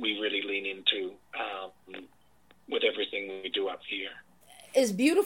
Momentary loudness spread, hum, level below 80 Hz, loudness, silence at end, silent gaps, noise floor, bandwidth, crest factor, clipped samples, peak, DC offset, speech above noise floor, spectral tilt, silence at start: 15 LU; none; -76 dBFS; -30 LUFS; 0 s; none; -64 dBFS; 17 kHz; 22 dB; under 0.1%; -8 dBFS; under 0.1%; 36 dB; -3 dB/octave; 0 s